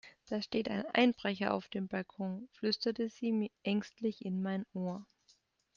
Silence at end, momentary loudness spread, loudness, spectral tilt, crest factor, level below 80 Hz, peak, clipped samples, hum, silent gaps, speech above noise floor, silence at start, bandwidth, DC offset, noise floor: 0.7 s; 10 LU; -36 LUFS; -6.5 dB/octave; 20 dB; -74 dBFS; -16 dBFS; under 0.1%; none; none; 36 dB; 0.05 s; 7.2 kHz; under 0.1%; -71 dBFS